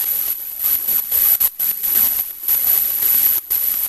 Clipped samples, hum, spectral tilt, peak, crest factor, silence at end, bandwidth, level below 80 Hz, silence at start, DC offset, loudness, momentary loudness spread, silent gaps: under 0.1%; none; 1 dB/octave; -2 dBFS; 16 dB; 0 s; 16 kHz; -52 dBFS; 0 s; under 0.1%; -14 LUFS; 6 LU; none